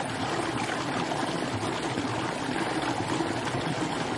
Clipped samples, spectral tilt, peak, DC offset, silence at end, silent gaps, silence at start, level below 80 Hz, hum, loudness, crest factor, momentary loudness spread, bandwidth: under 0.1%; -4.5 dB/octave; -14 dBFS; under 0.1%; 0 s; none; 0 s; -56 dBFS; none; -30 LUFS; 14 dB; 1 LU; 11.5 kHz